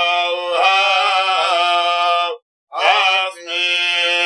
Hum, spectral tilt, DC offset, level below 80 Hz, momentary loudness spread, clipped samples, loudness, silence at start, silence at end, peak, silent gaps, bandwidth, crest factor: none; 2 dB/octave; under 0.1%; under -90 dBFS; 6 LU; under 0.1%; -15 LUFS; 0 s; 0 s; 0 dBFS; 2.42-2.67 s; 11.5 kHz; 16 dB